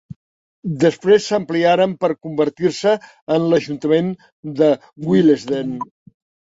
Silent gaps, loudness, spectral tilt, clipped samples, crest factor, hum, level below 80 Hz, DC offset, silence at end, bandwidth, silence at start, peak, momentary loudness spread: 3.22-3.27 s, 4.32-4.43 s; -18 LUFS; -6.5 dB/octave; under 0.1%; 16 dB; none; -60 dBFS; under 0.1%; 0.65 s; 8 kHz; 0.65 s; -2 dBFS; 13 LU